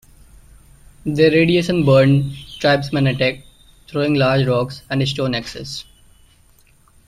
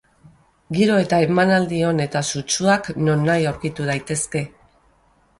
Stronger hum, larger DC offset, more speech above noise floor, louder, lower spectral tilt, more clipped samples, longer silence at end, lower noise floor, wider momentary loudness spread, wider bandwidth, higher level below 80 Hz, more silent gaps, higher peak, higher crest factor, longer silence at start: neither; neither; about the same, 36 dB vs 39 dB; first, -17 LUFS vs -20 LUFS; first, -6.5 dB/octave vs -5 dB/octave; neither; first, 1.25 s vs 0.9 s; second, -52 dBFS vs -58 dBFS; first, 15 LU vs 9 LU; first, 13 kHz vs 11.5 kHz; first, -46 dBFS vs -52 dBFS; neither; about the same, -2 dBFS vs -4 dBFS; about the same, 16 dB vs 16 dB; first, 1.05 s vs 0.7 s